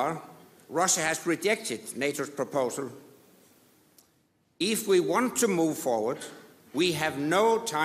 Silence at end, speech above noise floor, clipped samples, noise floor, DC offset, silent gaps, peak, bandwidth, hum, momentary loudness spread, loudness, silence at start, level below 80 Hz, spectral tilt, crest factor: 0 s; 41 dB; under 0.1%; -69 dBFS; under 0.1%; none; -12 dBFS; 15.5 kHz; none; 11 LU; -27 LUFS; 0 s; -74 dBFS; -3 dB/octave; 18 dB